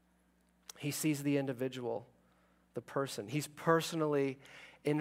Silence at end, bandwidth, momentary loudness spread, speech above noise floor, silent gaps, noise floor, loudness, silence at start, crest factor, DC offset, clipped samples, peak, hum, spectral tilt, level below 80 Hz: 0 s; 16 kHz; 17 LU; 36 dB; none; -72 dBFS; -36 LUFS; 0.75 s; 24 dB; under 0.1%; under 0.1%; -14 dBFS; none; -5 dB/octave; -80 dBFS